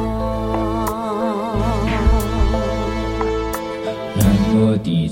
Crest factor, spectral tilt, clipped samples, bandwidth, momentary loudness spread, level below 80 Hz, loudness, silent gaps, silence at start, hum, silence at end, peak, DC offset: 16 dB; -7 dB/octave; under 0.1%; 17 kHz; 7 LU; -24 dBFS; -19 LUFS; none; 0 s; none; 0 s; -2 dBFS; under 0.1%